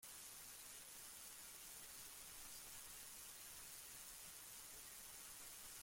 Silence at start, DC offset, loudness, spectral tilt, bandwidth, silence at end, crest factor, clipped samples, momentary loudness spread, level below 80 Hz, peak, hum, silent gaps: 0 s; under 0.1%; -54 LUFS; 0 dB/octave; 16.5 kHz; 0 s; 14 dB; under 0.1%; 1 LU; -76 dBFS; -42 dBFS; none; none